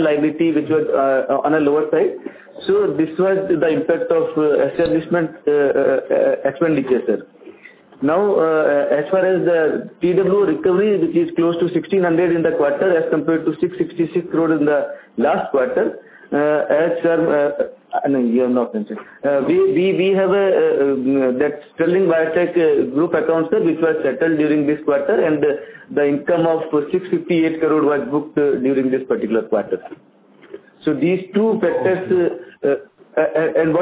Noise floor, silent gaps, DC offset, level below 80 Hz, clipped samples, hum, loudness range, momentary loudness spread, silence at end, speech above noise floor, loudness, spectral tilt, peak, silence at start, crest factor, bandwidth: -44 dBFS; none; under 0.1%; -58 dBFS; under 0.1%; none; 3 LU; 6 LU; 0 s; 27 dB; -18 LUFS; -11 dB/octave; -2 dBFS; 0 s; 14 dB; 4 kHz